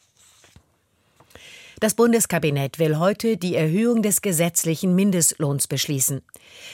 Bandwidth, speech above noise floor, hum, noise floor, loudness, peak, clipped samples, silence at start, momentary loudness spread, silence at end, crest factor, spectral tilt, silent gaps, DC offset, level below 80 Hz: 17 kHz; 44 dB; none; -64 dBFS; -20 LUFS; -6 dBFS; under 0.1%; 1.45 s; 5 LU; 0 s; 16 dB; -4.5 dB/octave; none; under 0.1%; -62 dBFS